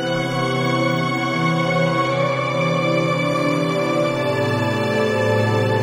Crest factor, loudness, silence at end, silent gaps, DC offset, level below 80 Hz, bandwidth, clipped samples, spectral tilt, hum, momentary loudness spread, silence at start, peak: 12 dB; -19 LUFS; 0 s; none; under 0.1%; -56 dBFS; 16 kHz; under 0.1%; -6 dB/octave; none; 2 LU; 0 s; -6 dBFS